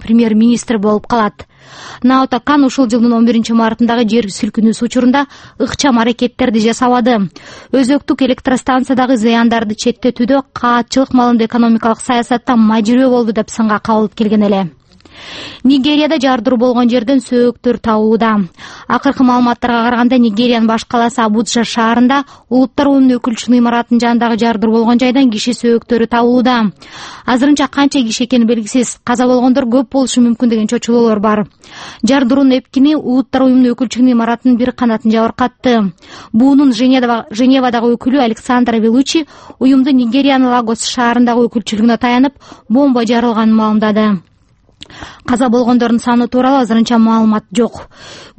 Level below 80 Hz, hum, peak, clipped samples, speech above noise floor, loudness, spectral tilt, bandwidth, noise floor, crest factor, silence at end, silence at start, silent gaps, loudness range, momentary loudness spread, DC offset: -46 dBFS; none; 0 dBFS; under 0.1%; 39 dB; -11 LUFS; -5 dB/octave; 8.8 kHz; -50 dBFS; 10 dB; 0.15 s; 0 s; none; 2 LU; 6 LU; under 0.1%